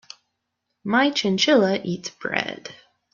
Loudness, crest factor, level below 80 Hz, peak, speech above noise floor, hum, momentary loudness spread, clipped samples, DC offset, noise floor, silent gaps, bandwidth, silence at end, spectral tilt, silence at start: -21 LUFS; 20 dB; -68 dBFS; -4 dBFS; 56 dB; none; 18 LU; under 0.1%; under 0.1%; -78 dBFS; none; 7.4 kHz; 0.4 s; -4 dB/octave; 0.85 s